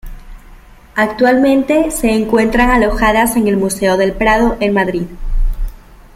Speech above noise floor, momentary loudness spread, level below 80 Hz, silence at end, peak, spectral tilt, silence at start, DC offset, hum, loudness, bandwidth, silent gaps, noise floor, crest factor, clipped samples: 26 dB; 11 LU; -22 dBFS; 0.2 s; 0 dBFS; -5 dB/octave; 0.05 s; under 0.1%; none; -13 LUFS; 16 kHz; none; -38 dBFS; 12 dB; under 0.1%